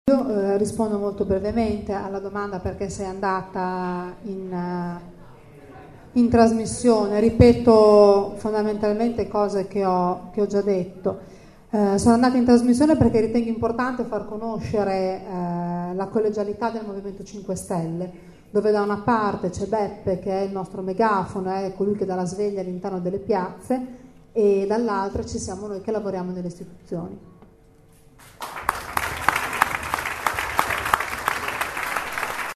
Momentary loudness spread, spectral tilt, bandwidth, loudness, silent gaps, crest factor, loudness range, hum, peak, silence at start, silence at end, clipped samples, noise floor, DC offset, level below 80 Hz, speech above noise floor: 13 LU; -6 dB/octave; 13.5 kHz; -22 LUFS; none; 22 dB; 11 LU; none; 0 dBFS; 0.05 s; 0 s; under 0.1%; -52 dBFS; under 0.1%; -44 dBFS; 30 dB